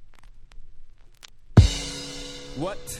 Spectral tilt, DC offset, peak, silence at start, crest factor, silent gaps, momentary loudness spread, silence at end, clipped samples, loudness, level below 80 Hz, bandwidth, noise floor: -5.5 dB/octave; under 0.1%; -2 dBFS; 0 s; 24 dB; none; 18 LU; 0 s; under 0.1%; -23 LUFS; -32 dBFS; 14.5 kHz; -46 dBFS